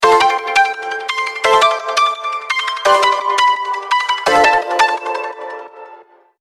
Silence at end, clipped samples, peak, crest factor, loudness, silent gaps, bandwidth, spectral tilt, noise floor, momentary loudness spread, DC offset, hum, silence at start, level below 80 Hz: 0.4 s; under 0.1%; 0 dBFS; 14 dB; -14 LUFS; none; 15 kHz; -1 dB/octave; -43 dBFS; 11 LU; under 0.1%; none; 0 s; -54 dBFS